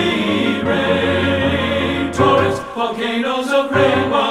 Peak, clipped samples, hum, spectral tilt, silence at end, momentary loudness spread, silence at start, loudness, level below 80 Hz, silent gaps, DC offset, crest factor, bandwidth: -2 dBFS; under 0.1%; none; -5.5 dB/octave; 0 s; 5 LU; 0 s; -16 LUFS; -42 dBFS; none; under 0.1%; 14 dB; 14 kHz